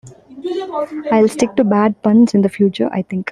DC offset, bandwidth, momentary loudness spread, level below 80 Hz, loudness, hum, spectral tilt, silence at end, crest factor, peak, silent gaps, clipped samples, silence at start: under 0.1%; 12 kHz; 11 LU; -56 dBFS; -15 LUFS; none; -7 dB/octave; 0 s; 14 dB; -2 dBFS; none; under 0.1%; 0.05 s